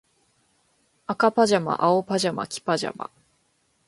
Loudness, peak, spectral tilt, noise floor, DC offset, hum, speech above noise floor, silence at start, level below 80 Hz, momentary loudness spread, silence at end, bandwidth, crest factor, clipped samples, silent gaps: -23 LUFS; -4 dBFS; -4.5 dB/octave; -68 dBFS; under 0.1%; none; 45 dB; 1.1 s; -68 dBFS; 16 LU; 0.8 s; 11.5 kHz; 20 dB; under 0.1%; none